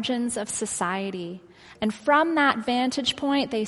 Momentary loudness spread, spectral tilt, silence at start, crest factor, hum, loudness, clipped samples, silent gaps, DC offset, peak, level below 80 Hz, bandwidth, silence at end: 11 LU; -3 dB/octave; 0 s; 20 dB; none; -24 LUFS; under 0.1%; none; under 0.1%; -6 dBFS; -60 dBFS; 12 kHz; 0 s